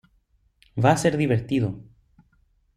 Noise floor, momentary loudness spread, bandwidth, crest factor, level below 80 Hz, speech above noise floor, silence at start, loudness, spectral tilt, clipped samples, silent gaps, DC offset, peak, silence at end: -65 dBFS; 15 LU; 13 kHz; 22 dB; -54 dBFS; 43 dB; 0.75 s; -23 LUFS; -6.5 dB/octave; under 0.1%; none; under 0.1%; -4 dBFS; 0.95 s